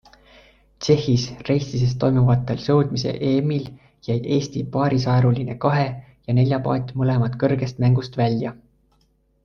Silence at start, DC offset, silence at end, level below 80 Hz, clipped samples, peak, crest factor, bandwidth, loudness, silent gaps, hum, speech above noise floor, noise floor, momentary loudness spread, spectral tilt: 0.8 s; under 0.1%; 0.9 s; -48 dBFS; under 0.1%; -4 dBFS; 18 dB; 6.8 kHz; -21 LUFS; none; none; 43 dB; -63 dBFS; 8 LU; -7.5 dB/octave